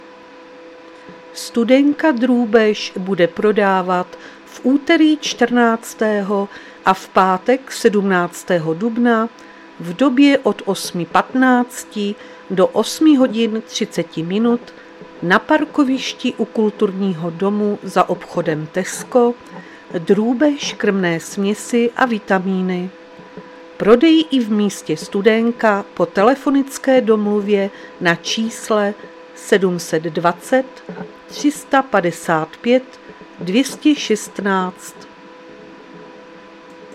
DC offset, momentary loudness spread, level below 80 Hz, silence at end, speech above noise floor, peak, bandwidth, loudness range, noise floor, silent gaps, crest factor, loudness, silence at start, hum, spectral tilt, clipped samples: under 0.1%; 12 LU; -60 dBFS; 0 s; 23 dB; 0 dBFS; 15 kHz; 3 LU; -40 dBFS; none; 18 dB; -17 LUFS; 0 s; none; -5 dB/octave; under 0.1%